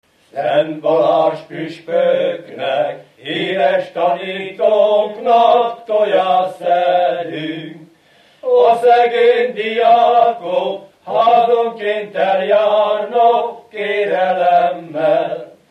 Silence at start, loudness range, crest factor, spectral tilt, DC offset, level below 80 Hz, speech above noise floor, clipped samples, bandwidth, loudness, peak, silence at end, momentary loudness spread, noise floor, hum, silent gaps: 0.35 s; 4 LU; 14 dB; -5.5 dB/octave; under 0.1%; -74 dBFS; 36 dB; under 0.1%; 9.2 kHz; -15 LUFS; -2 dBFS; 0.2 s; 13 LU; -51 dBFS; none; none